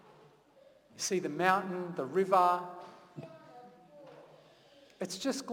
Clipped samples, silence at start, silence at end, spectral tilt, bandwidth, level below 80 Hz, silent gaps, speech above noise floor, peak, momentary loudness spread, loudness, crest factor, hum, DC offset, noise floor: under 0.1%; 0.95 s; 0 s; -4 dB/octave; 18 kHz; -82 dBFS; none; 31 dB; -12 dBFS; 27 LU; -32 LUFS; 22 dB; none; under 0.1%; -62 dBFS